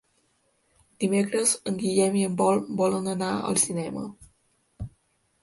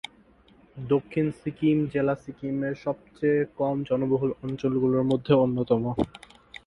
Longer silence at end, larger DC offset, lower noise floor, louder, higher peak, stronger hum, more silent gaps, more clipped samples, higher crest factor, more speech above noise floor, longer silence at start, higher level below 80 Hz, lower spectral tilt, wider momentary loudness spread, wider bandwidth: about the same, 0.55 s vs 0.5 s; neither; first, -69 dBFS vs -57 dBFS; about the same, -25 LUFS vs -26 LUFS; about the same, -8 dBFS vs -6 dBFS; neither; neither; neither; about the same, 20 dB vs 20 dB; first, 44 dB vs 32 dB; first, 1 s vs 0.75 s; about the same, -58 dBFS vs -56 dBFS; second, -4.5 dB/octave vs -9 dB/octave; first, 18 LU vs 10 LU; about the same, 12 kHz vs 11 kHz